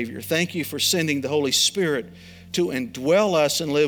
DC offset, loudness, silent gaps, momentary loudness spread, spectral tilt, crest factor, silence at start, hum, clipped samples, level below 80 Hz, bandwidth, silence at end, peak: under 0.1%; -22 LUFS; none; 8 LU; -3 dB/octave; 16 dB; 0 s; none; under 0.1%; -62 dBFS; over 20 kHz; 0 s; -6 dBFS